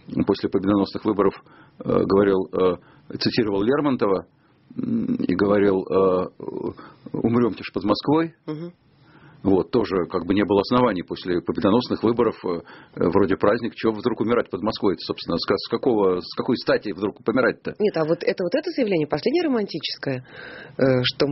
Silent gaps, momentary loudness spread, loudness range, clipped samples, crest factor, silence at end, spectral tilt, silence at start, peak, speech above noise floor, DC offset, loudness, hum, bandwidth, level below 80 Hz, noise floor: none; 11 LU; 2 LU; under 0.1%; 18 dB; 0 s; -5 dB/octave; 0.1 s; -4 dBFS; 29 dB; under 0.1%; -22 LUFS; none; 6 kHz; -54 dBFS; -51 dBFS